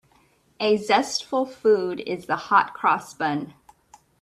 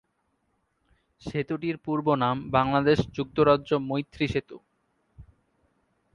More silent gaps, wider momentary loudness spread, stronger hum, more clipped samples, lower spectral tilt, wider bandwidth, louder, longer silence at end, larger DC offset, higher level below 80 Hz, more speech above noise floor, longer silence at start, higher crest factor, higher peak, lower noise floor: neither; about the same, 8 LU vs 10 LU; neither; neither; second, -4 dB/octave vs -7.5 dB/octave; first, 13 kHz vs 7.4 kHz; first, -23 LUFS vs -26 LUFS; second, 0.7 s vs 0.95 s; neither; second, -68 dBFS vs -52 dBFS; second, 38 dB vs 48 dB; second, 0.6 s vs 1.25 s; about the same, 20 dB vs 22 dB; about the same, -4 dBFS vs -6 dBFS; second, -61 dBFS vs -74 dBFS